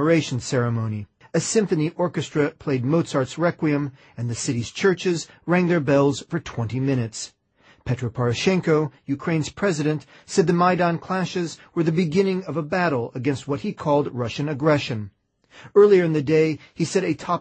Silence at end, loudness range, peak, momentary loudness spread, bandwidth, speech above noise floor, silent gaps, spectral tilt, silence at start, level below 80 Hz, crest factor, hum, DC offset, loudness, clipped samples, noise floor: 0 s; 3 LU; -6 dBFS; 10 LU; 8.8 kHz; 35 dB; none; -6 dB/octave; 0 s; -56 dBFS; 16 dB; none; under 0.1%; -22 LUFS; under 0.1%; -57 dBFS